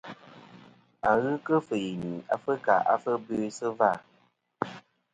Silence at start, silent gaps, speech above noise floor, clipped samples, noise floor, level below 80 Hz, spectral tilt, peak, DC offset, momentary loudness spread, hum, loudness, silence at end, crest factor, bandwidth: 0.05 s; none; 40 dB; under 0.1%; -67 dBFS; -66 dBFS; -6 dB/octave; -8 dBFS; under 0.1%; 12 LU; none; -28 LUFS; 0.35 s; 20 dB; 9.4 kHz